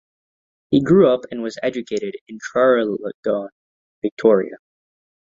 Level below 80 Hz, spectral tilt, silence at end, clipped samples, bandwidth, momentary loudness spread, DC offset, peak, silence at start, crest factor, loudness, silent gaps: -60 dBFS; -7 dB/octave; 0.65 s; under 0.1%; 7.6 kHz; 15 LU; under 0.1%; -2 dBFS; 0.7 s; 18 dB; -19 LUFS; 2.21-2.26 s, 3.14-3.23 s, 3.52-4.02 s, 4.12-4.17 s